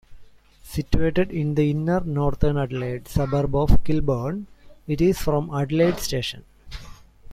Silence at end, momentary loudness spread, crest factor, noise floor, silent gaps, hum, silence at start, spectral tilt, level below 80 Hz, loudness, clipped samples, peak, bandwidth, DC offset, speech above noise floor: 0 s; 18 LU; 18 dB; -46 dBFS; none; none; 0.1 s; -7 dB/octave; -32 dBFS; -24 LUFS; under 0.1%; -2 dBFS; 15.5 kHz; under 0.1%; 26 dB